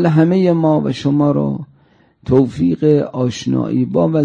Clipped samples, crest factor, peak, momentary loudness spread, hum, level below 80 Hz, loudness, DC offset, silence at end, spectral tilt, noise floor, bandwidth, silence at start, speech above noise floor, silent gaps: under 0.1%; 14 dB; -2 dBFS; 7 LU; none; -48 dBFS; -15 LUFS; under 0.1%; 0 s; -8 dB/octave; -52 dBFS; 9 kHz; 0 s; 38 dB; none